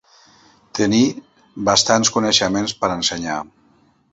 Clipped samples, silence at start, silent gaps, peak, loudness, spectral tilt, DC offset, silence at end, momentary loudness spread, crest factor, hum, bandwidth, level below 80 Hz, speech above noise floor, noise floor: under 0.1%; 0.75 s; none; 0 dBFS; -17 LUFS; -3 dB/octave; under 0.1%; 0.65 s; 14 LU; 20 dB; none; 8.2 kHz; -52 dBFS; 39 dB; -57 dBFS